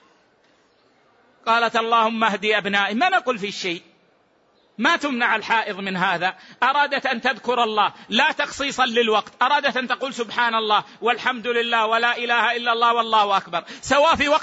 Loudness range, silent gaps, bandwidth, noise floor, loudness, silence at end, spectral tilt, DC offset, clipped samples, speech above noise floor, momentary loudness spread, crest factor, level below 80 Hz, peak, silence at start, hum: 2 LU; none; 8 kHz; -60 dBFS; -20 LUFS; 0 s; -3 dB/octave; under 0.1%; under 0.1%; 40 dB; 7 LU; 16 dB; -58 dBFS; -6 dBFS; 1.45 s; none